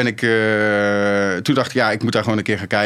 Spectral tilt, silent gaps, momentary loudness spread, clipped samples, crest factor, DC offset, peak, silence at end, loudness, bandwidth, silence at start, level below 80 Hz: -5.5 dB/octave; none; 3 LU; under 0.1%; 16 dB; under 0.1%; -2 dBFS; 0 s; -18 LUFS; 14.5 kHz; 0 s; -62 dBFS